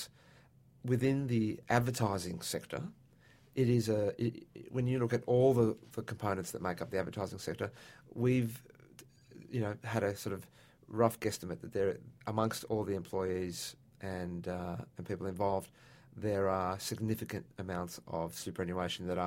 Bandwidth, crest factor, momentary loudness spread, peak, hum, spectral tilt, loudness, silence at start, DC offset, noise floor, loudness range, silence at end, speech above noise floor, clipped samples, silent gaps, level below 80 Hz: 16.5 kHz; 22 dB; 12 LU; -12 dBFS; none; -6 dB/octave; -36 LUFS; 0 s; under 0.1%; -63 dBFS; 5 LU; 0 s; 28 dB; under 0.1%; none; -64 dBFS